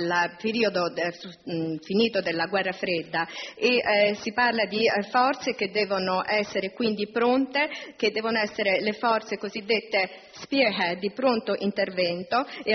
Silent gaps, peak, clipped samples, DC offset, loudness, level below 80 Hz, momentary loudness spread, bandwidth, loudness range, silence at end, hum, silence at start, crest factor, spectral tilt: none; -10 dBFS; under 0.1%; under 0.1%; -25 LUFS; -68 dBFS; 7 LU; 6.4 kHz; 2 LU; 0 s; none; 0 s; 16 dB; -2 dB/octave